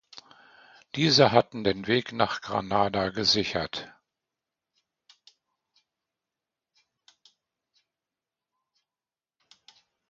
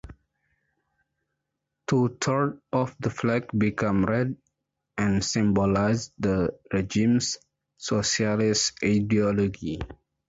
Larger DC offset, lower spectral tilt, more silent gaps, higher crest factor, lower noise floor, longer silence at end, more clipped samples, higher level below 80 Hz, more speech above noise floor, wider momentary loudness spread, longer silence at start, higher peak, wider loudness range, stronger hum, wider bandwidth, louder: neither; about the same, -4.5 dB/octave vs -5 dB/octave; neither; first, 28 dB vs 14 dB; first, under -90 dBFS vs -82 dBFS; first, 6.2 s vs 0.35 s; neither; second, -60 dBFS vs -48 dBFS; first, over 65 dB vs 58 dB; first, 14 LU vs 11 LU; about the same, 0.15 s vs 0.05 s; first, -4 dBFS vs -12 dBFS; first, 11 LU vs 3 LU; neither; about the same, 7.6 kHz vs 8 kHz; about the same, -25 LUFS vs -25 LUFS